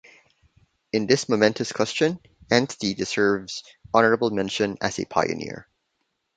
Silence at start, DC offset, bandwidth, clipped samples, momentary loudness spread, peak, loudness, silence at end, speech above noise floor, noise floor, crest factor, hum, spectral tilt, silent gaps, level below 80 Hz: 0.95 s; under 0.1%; 9.4 kHz; under 0.1%; 12 LU; -2 dBFS; -23 LUFS; 0.75 s; 52 dB; -75 dBFS; 22 dB; none; -4.5 dB/octave; none; -58 dBFS